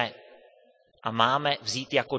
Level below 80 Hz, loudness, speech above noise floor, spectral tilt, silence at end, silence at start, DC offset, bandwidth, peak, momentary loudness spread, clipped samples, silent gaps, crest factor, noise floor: -72 dBFS; -27 LUFS; 35 dB; -3.5 dB/octave; 0 s; 0 s; under 0.1%; 8 kHz; -6 dBFS; 9 LU; under 0.1%; none; 24 dB; -61 dBFS